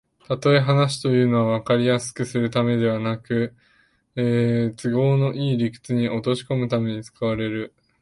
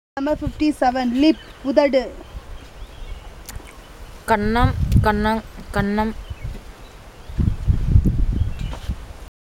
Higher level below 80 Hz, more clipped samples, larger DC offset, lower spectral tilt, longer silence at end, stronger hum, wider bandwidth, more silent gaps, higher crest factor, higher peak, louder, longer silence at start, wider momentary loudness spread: second, -56 dBFS vs -28 dBFS; neither; neither; about the same, -6.5 dB/octave vs -7 dB/octave; first, 0.35 s vs 0.15 s; neither; second, 11.5 kHz vs 16.5 kHz; neither; about the same, 16 dB vs 20 dB; second, -6 dBFS vs -2 dBFS; about the same, -22 LUFS vs -20 LUFS; first, 0.3 s vs 0.15 s; second, 8 LU vs 22 LU